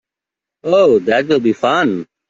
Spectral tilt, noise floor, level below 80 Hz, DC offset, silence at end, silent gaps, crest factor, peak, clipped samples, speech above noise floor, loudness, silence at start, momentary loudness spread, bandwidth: -6 dB/octave; -85 dBFS; -56 dBFS; under 0.1%; 0.25 s; none; 12 dB; -2 dBFS; under 0.1%; 72 dB; -14 LUFS; 0.65 s; 6 LU; 7.6 kHz